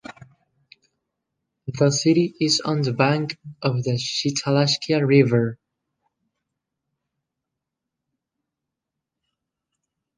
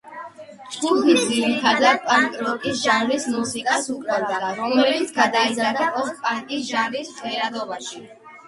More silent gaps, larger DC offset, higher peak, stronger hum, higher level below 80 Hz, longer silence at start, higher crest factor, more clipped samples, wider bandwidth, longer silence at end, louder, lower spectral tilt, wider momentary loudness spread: neither; neither; about the same, -2 dBFS vs -2 dBFS; neither; about the same, -64 dBFS vs -66 dBFS; about the same, 0.1 s vs 0.05 s; about the same, 22 dB vs 20 dB; neither; second, 10 kHz vs 11.5 kHz; first, 4.65 s vs 0 s; about the same, -21 LUFS vs -21 LUFS; first, -5 dB/octave vs -2.5 dB/octave; second, 10 LU vs 13 LU